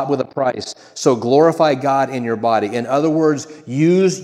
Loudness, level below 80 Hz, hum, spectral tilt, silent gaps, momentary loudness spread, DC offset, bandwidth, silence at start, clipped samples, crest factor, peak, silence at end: -17 LUFS; -68 dBFS; none; -6 dB/octave; none; 8 LU; under 0.1%; 12.5 kHz; 0 s; under 0.1%; 16 dB; 0 dBFS; 0 s